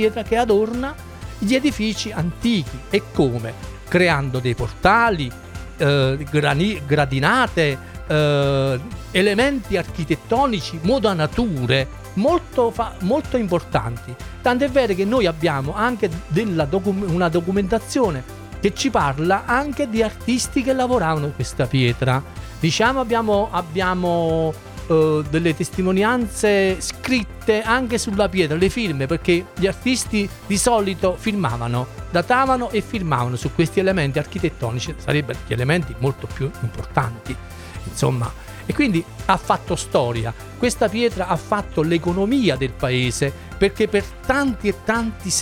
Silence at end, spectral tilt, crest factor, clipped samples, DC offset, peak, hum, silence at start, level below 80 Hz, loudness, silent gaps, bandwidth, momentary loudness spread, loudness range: 0 s; -5.5 dB/octave; 18 dB; under 0.1%; under 0.1%; -2 dBFS; none; 0 s; -38 dBFS; -20 LUFS; none; 17.5 kHz; 8 LU; 3 LU